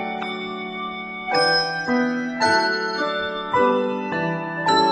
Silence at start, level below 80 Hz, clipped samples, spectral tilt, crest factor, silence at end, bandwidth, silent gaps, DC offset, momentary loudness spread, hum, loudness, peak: 0 s; -60 dBFS; under 0.1%; -4 dB/octave; 16 dB; 0 s; 9.8 kHz; none; under 0.1%; 10 LU; none; -22 LUFS; -6 dBFS